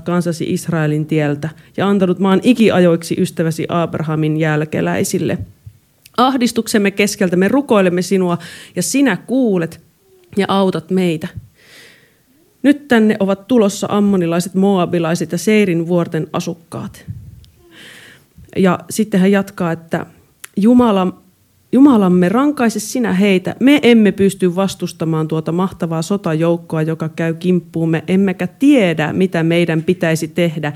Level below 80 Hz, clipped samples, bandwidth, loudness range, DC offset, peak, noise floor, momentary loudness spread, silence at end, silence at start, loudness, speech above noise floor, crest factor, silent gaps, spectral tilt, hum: -52 dBFS; under 0.1%; 15.5 kHz; 6 LU; under 0.1%; 0 dBFS; -54 dBFS; 10 LU; 0 s; 0 s; -15 LUFS; 39 dB; 16 dB; none; -6 dB/octave; none